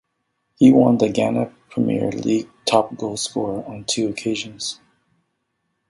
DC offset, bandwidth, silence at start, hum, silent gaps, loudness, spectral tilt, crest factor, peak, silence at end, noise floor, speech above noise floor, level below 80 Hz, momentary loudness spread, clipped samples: under 0.1%; 11.5 kHz; 0.6 s; none; none; -20 LUFS; -5 dB/octave; 20 dB; 0 dBFS; 1.15 s; -73 dBFS; 55 dB; -58 dBFS; 13 LU; under 0.1%